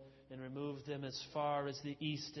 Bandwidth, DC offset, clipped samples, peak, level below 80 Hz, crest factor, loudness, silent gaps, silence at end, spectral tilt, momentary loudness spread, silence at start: 6.2 kHz; under 0.1%; under 0.1%; -26 dBFS; -74 dBFS; 16 dB; -42 LUFS; none; 0 s; -4.5 dB/octave; 10 LU; 0 s